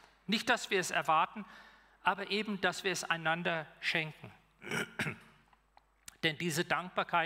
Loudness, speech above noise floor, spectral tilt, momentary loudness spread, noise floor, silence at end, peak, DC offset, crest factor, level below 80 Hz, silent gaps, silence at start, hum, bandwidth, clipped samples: -34 LUFS; 34 dB; -3.5 dB/octave; 9 LU; -68 dBFS; 0 s; -14 dBFS; under 0.1%; 22 dB; -72 dBFS; none; 0.3 s; none; 16 kHz; under 0.1%